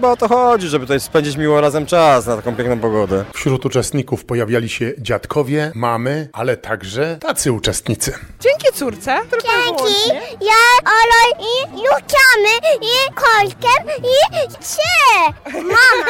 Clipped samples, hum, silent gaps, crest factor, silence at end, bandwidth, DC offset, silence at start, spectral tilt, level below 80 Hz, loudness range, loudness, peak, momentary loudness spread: under 0.1%; none; none; 12 dB; 0 s; 16.5 kHz; under 0.1%; 0 s; -3.5 dB/octave; -42 dBFS; 7 LU; -14 LUFS; -2 dBFS; 11 LU